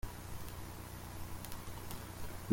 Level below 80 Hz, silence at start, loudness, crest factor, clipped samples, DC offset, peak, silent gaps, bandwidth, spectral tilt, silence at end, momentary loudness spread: -52 dBFS; 0.05 s; -48 LUFS; 26 dB; under 0.1%; under 0.1%; -14 dBFS; none; 16.5 kHz; -4.5 dB/octave; 0 s; 1 LU